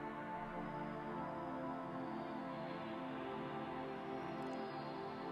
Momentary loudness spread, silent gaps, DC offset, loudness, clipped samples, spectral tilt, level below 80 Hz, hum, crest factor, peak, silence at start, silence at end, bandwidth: 1 LU; none; under 0.1%; -46 LUFS; under 0.1%; -7.5 dB/octave; -70 dBFS; none; 14 dB; -32 dBFS; 0 s; 0 s; 13 kHz